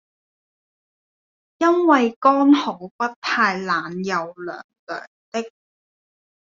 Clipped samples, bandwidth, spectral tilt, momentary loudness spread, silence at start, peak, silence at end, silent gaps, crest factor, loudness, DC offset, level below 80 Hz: under 0.1%; 7.4 kHz; -3 dB/octave; 17 LU; 1.6 s; -2 dBFS; 0.95 s; 2.16-2.21 s, 2.91-2.99 s, 3.16-3.22 s, 4.64-4.69 s, 4.79-4.87 s, 5.07-5.32 s; 20 dB; -19 LUFS; under 0.1%; -72 dBFS